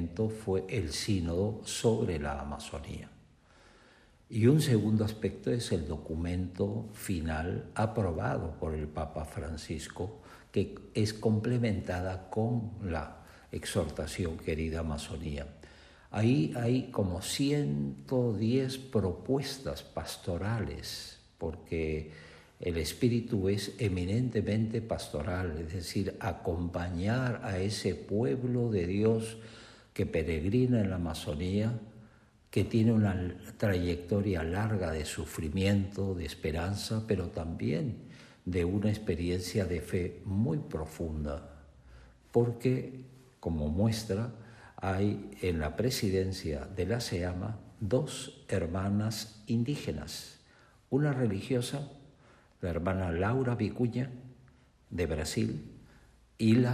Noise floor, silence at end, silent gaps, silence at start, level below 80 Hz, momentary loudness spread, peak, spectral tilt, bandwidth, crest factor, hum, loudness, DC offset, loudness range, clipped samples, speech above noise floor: -61 dBFS; 0 s; none; 0 s; -52 dBFS; 11 LU; -12 dBFS; -6.5 dB/octave; 14 kHz; 20 dB; none; -33 LUFS; under 0.1%; 4 LU; under 0.1%; 30 dB